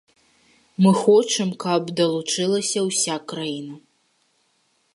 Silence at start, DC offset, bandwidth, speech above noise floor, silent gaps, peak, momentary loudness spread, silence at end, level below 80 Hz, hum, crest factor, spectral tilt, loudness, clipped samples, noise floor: 0.8 s; under 0.1%; 11.5 kHz; 46 dB; none; -4 dBFS; 13 LU; 1.15 s; -74 dBFS; none; 18 dB; -4.5 dB/octave; -21 LUFS; under 0.1%; -66 dBFS